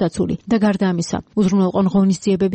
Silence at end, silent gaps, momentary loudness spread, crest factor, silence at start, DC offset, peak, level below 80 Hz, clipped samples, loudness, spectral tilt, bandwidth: 0 s; none; 6 LU; 10 dB; 0 s; under 0.1%; -8 dBFS; -46 dBFS; under 0.1%; -18 LUFS; -7 dB/octave; 8.8 kHz